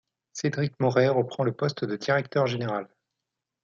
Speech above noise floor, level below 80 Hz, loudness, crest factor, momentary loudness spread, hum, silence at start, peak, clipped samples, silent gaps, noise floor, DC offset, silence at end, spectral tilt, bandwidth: 60 dB; -70 dBFS; -26 LUFS; 20 dB; 9 LU; none; 0.35 s; -8 dBFS; under 0.1%; none; -86 dBFS; under 0.1%; 0.8 s; -6 dB/octave; 7.4 kHz